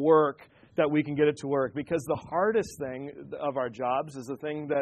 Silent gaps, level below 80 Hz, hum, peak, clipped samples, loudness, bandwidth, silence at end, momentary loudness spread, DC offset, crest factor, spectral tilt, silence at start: none; -64 dBFS; none; -8 dBFS; under 0.1%; -29 LUFS; 13 kHz; 0 s; 11 LU; under 0.1%; 20 dB; -6.5 dB/octave; 0 s